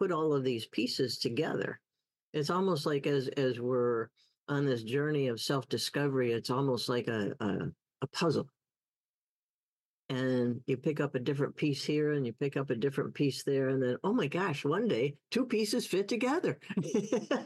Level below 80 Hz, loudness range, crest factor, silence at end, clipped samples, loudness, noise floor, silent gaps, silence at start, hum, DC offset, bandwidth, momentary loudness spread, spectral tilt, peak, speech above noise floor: -78 dBFS; 4 LU; 14 dB; 0 s; under 0.1%; -33 LUFS; under -90 dBFS; 2.22-2.33 s, 4.37-4.47 s, 8.88-10.09 s; 0 s; none; under 0.1%; 12.5 kHz; 6 LU; -5.5 dB/octave; -18 dBFS; over 58 dB